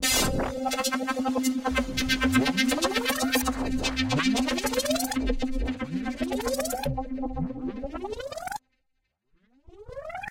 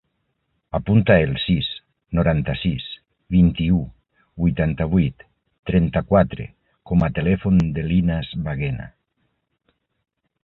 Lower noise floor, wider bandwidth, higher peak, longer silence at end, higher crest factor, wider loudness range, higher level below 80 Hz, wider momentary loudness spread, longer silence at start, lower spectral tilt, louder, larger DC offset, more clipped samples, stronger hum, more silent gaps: first, -76 dBFS vs -72 dBFS; first, 17 kHz vs 4.2 kHz; second, -10 dBFS vs -2 dBFS; second, 0 s vs 1.55 s; about the same, 18 dB vs 20 dB; first, 9 LU vs 2 LU; about the same, -40 dBFS vs -36 dBFS; second, 12 LU vs 15 LU; second, 0 s vs 0.75 s; second, -3.5 dB/octave vs -9.5 dB/octave; second, -27 LUFS vs -20 LUFS; neither; neither; neither; second, none vs 5.59-5.63 s